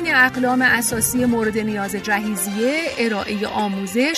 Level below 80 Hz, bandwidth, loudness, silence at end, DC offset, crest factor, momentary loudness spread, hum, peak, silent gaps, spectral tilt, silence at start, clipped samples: -50 dBFS; 14 kHz; -19 LUFS; 0 s; under 0.1%; 16 dB; 7 LU; none; -4 dBFS; none; -3.5 dB/octave; 0 s; under 0.1%